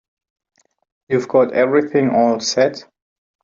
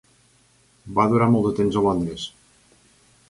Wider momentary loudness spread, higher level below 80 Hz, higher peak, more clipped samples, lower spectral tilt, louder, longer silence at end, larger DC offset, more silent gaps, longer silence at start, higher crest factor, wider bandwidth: second, 7 LU vs 13 LU; second, -64 dBFS vs -50 dBFS; first, -2 dBFS vs -6 dBFS; neither; second, -4.5 dB/octave vs -7.5 dB/octave; first, -16 LUFS vs -21 LUFS; second, 0.6 s vs 1 s; neither; neither; first, 1.1 s vs 0.85 s; about the same, 16 dB vs 18 dB; second, 7.6 kHz vs 11.5 kHz